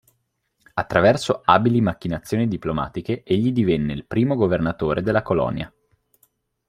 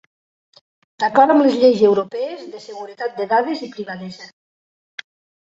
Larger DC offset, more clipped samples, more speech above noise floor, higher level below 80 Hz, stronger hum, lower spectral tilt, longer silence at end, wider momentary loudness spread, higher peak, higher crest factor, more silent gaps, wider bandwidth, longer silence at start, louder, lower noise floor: neither; neither; second, 51 dB vs over 73 dB; first, -48 dBFS vs -66 dBFS; neither; about the same, -7 dB/octave vs -6 dB/octave; second, 1 s vs 1.15 s; second, 11 LU vs 24 LU; about the same, -2 dBFS vs -2 dBFS; about the same, 20 dB vs 18 dB; neither; first, 14.5 kHz vs 8 kHz; second, 0.75 s vs 1 s; second, -21 LUFS vs -17 LUFS; second, -71 dBFS vs under -90 dBFS